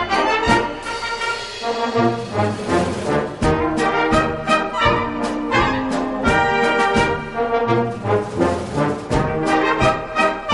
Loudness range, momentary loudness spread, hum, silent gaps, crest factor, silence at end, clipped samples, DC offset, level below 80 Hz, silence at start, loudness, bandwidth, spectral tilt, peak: 2 LU; 6 LU; none; none; 18 dB; 0 s; under 0.1%; under 0.1%; -36 dBFS; 0 s; -19 LUFS; 11.5 kHz; -5.5 dB/octave; 0 dBFS